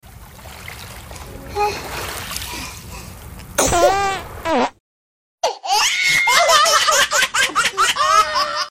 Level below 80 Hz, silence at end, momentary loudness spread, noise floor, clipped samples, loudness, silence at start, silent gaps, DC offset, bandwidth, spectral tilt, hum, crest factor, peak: -40 dBFS; 0 s; 22 LU; -39 dBFS; under 0.1%; -16 LUFS; 0.05 s; 4.80-5.38 s; under 0.1%; 16.5 kHz; -1 dB/octave; none; 18 dB; 0 dBFS